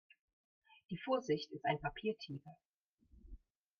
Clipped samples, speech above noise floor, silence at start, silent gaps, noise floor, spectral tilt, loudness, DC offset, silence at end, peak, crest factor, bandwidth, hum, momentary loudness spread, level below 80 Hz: under 0.1%; 29 dB; 0.9 s; 2.65-2.98 s; -69 dBFS; -6 dB/octave; -41 LUFS; under 0.1%; 0.45 s; -22 dBFS; 20 dB; 7 kHz; none; 25 LU; -66 dBFS